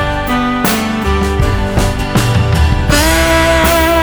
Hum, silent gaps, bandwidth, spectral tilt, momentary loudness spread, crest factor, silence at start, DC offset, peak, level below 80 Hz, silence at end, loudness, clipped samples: none; none; over 20 kHz; -5 dB/octave; 5 LU; 12 dB; 0 s; under 0.1%; 0 dBFS; -18 dBFS; 0 s; -12 LUFS; under 0.1%